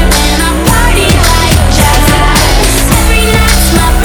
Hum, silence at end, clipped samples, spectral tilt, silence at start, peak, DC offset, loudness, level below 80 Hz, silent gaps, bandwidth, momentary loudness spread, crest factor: none; 0 s; 3%; -4 dB/octave; 0 s; 0 dBFS; under 0.1%; -7 LUFS; -10 dBFS; none; over 20 kHz; 1 LU; 6 dB